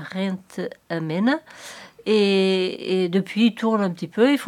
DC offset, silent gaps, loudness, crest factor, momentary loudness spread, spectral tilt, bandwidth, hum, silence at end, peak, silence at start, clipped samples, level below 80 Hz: under 0.1%; none; -22 LUFS; 16 dB; 14 LU; -6 dB/octave; 14.5 kHz; none; 0 s; -6 dBFS; 0 s; under 0.1%; -72 dBFS